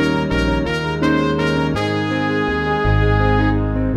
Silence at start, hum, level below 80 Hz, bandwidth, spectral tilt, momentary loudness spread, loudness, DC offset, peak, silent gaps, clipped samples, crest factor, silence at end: 0 s; none; -26 dBFS; 11.5 kHz; -7 dB/octave; 4 LU; -18 LUFS; under 0.1%; -4 dBFS; none; under 0.1%; 14 dB; 0 s